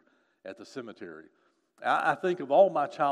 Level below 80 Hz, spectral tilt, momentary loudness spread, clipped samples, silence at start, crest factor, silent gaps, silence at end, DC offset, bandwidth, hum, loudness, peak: -86 dBFS; -5.5 dB/octave; 23 LU; under 0.1%; 0.45 s; 20 dB; none; 0 s; under 0.1%; 10 kHz; none; -26 LUFS; -10 dBFS